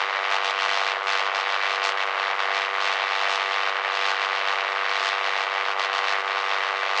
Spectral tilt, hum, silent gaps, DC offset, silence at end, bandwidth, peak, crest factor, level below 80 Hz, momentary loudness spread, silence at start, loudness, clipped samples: 4 dB/octave; none; none; under 0.1%; 0 s; 10.5 kHz; -8 dBFS; 18 dB; under -90 dBFS; 1 LU; 0 s; -23 LUFS; under 0.1%